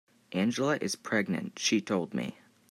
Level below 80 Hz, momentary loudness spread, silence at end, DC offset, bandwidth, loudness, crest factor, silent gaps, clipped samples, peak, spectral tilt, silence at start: -76 dBFS; 8 LU; 0.4 s; under 0.1%; 14 kHz; -31 LUFS; 16 dB; none; under 0.1%; -16 dBFS; -4 dB/octave; 0.3 s